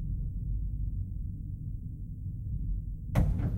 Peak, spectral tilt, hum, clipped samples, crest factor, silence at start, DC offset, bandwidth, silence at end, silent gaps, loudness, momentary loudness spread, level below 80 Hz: -14 dBFS; -9 dB/octave; none; under 0.1%; 18 dB; 0 s; under 0.1%; 12.5 kHz; 0 s; none; -36 LUFS; 10 LU; -36 dBFS